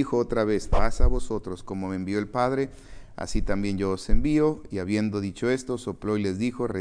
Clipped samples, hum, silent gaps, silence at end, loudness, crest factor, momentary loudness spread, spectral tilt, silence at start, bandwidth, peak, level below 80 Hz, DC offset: under 0.1%; none; none; 0 s; -27 LUFS; 18 dB; 8 LU; -6.5 dB/octave; 0 s; 10.5 kHz; -6 dBFS; -30 dBFS; under 0.1%